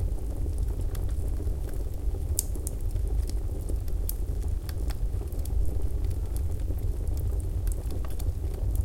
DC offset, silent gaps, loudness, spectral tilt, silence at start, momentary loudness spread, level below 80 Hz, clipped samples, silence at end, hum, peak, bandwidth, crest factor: under 0.1%; none; -33 LUFS; -6 dB/octave; 0 s; 3 LU; -30 dBFS; under 0.1%; 0 s; none; -4 dBFS; 17 kHz; 24 dB